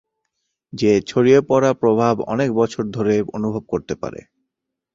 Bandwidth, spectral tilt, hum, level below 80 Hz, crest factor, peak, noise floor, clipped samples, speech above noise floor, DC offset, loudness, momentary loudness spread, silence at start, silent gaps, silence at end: 7.6 kHz; -6.5 dB/octave; none; -52 dBFS; 18 dB; -2 dBFS; -80 dBFS; under 0.1%; 63 dB; under 0.1%; -18 LUFS; 12 LU; 0.75 s; none; 0.8 s